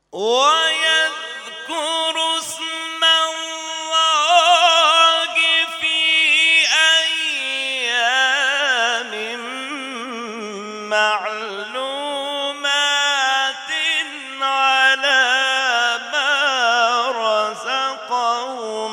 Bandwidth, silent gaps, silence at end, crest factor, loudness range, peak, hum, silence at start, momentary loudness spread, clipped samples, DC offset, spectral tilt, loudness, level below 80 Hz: 18 kHz; none; 0 s; 18 dB; 7 LU; 0 dBFS; 50 Hz at -75 dBFS; 0.15 s; 14 LU; under 0.1%; under 0.1%; 1 dB/octave; -16 LUFS; -74 dBFS